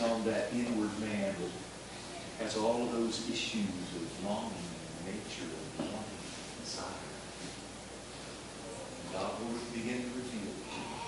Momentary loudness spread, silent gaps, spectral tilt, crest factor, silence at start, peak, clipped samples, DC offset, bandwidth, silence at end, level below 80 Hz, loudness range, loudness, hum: 11 LU; none; -4 dB/octave; 18 dB; 0 s; -20 dBFS; under 0.1%; under 0.1%; 11.5 kHz; 0 s; -60 dBFS; 7 LU; -38 LUFS; none